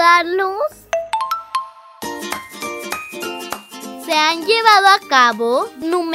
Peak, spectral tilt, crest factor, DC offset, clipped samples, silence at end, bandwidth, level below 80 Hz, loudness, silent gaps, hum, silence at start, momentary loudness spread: 0 dBFS; -1.5 dB/octave; 18 dB; under 0.1%; under 0.1%; 0 s; 16 kHz; -60 dBFS; -16 LUFS; none; none; 0 s; 18 LU